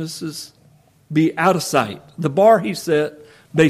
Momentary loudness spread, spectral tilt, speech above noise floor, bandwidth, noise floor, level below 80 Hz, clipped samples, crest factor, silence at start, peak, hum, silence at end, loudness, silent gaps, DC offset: 15 LU; -5.5 dB/octave; 35 dB; 15.5 kHz; -53 dBFS; -60 dBFS; under 0.1%; 16 dB; 0 s; -2 dBFS; none; 0 s; -18 LUFS; none; under 0.1%